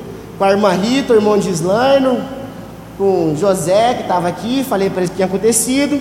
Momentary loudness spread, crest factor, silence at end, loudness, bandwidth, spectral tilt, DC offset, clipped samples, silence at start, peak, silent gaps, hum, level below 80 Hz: 11 LU; 14 dB; 0 s; -14 LUFS; 16.5 kHz; -4.5 dB/octave; under 0.1%; under 0.1%; 0 s; 0 dBFS; none; none; -44 dBFS